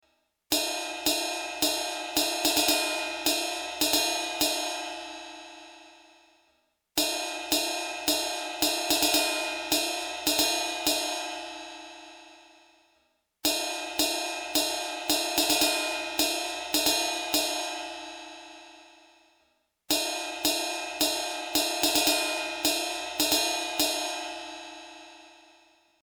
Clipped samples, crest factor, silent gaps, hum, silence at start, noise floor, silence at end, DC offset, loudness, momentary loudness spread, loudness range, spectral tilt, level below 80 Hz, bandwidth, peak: under 0.1%; 20 dB; none; none; 0.5 s; -71 dBFS; 0.7 s; under 0.1%; -26 LUFS; 17 LU; 6 LU; 0 dB/octave; -62 dBFS; over 20 kHz; -10 dBFS